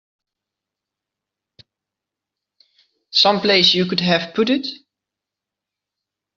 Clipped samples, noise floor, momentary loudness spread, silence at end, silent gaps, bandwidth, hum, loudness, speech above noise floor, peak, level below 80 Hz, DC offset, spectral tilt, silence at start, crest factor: under 0.1%; -85 dBFS; 8 LU; 1.6 s; none; 7.4 kHz; none; -16 LUFS; 69 dB; -2 dBFS; -64 dBFS; under 0.1%; -2 dB/octave; 3.15 s; 20 dB